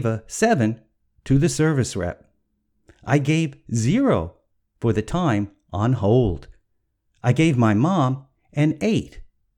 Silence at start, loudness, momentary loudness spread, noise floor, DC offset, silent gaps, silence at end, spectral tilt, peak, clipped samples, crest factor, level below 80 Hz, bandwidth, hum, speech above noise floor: 0 s; -21 LUFS; 13 LU; -70 dBFS; under 0.1%; none; 0.3 s; -6.5 dB/octave; -4 dBFS; under 0.1%; 18 dB; -44 dBFS; 13 kHz; none; 51 dB